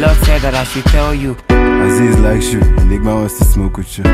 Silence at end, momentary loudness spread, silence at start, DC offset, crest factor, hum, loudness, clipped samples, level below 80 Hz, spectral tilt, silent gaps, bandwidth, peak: 0 s; 6 LU; 0 s; under 0.1%; 10 dB; none; -13 LUFS; under 0.1%; -14 dBFS; -6 dB/octave; none; 15.5 kHz; 0 dBFS